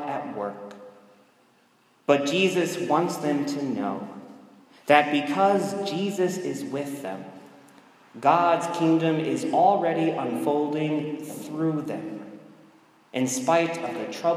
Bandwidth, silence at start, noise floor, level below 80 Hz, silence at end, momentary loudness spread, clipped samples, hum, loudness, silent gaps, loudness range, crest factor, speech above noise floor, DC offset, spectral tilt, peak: 15.5 kHz; 0 s; -62 dBFS; -80 dBFS; 0 s; 15 LU; under 0.1%; none; -25 LUFS; none; 5 LU; 24 dB; 38 dB; under 0.1%; -5 dB/octave; -2 dBFS